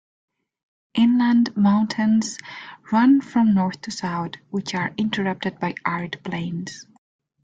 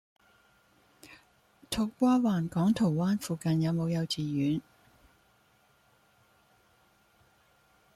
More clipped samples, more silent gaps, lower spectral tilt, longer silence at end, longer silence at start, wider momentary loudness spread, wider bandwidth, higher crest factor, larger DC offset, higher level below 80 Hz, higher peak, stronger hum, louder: neither; neither; about the same, -5.5 dB/octave vs -6.5 dB/octave; second, 0.6 s vs 3.35 s; about the same, 0.95 s vs 1.05 s; first, 13 LU vs 7 LU; second, 9 kHz vs 14.5 kHz; about the same, 16 dB vs 18 dB; neither; about the same, -62 dBFS vs -64 dBFS; first, -6 dBFS vs -16 dBFS; neither; first, -22 LUFS vs -29 LUFS